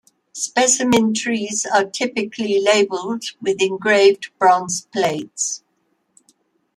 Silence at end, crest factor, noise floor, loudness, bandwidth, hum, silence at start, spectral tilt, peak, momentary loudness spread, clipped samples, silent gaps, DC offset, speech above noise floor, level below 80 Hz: 1.2 s; 18 dB; -67 dBFS; -18 LUFS; 13.5 kHz; none; 0.35 s; -2.5 dB/octave; -2 dBFS; 10 LU; under 0.1%; none; under 0.1%; 49 dB; -64 dBFS